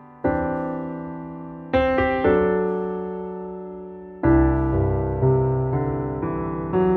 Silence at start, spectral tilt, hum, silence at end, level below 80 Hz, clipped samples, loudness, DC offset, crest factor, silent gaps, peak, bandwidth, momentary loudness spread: 0 s; -10.5 dB/octave; none; 0 s; -34 dBFS; under 0.1%; -22 LUFS; under 0.1%; 16 dB; none; -6 dBFS; 4.6 kHz; 15 LU